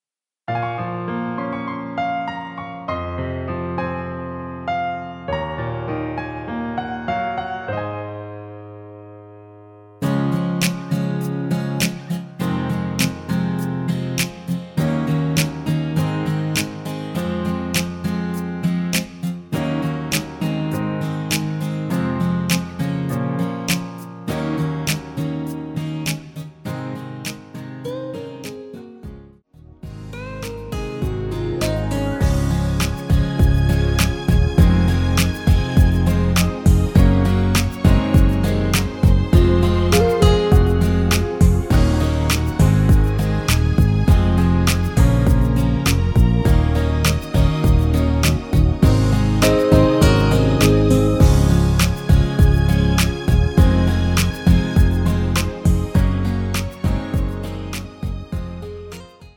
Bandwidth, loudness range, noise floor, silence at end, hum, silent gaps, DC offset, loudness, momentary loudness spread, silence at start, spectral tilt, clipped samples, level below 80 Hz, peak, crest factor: 18 kHz; 11 LU; -46 dBFS; 0.1 s; none; none; under 0.1%; -19 LUFS; 14 LU; 0.5 s; -6 dB/octave; under 0.1%; -24 dBFS; 0 dBFS; 18 dB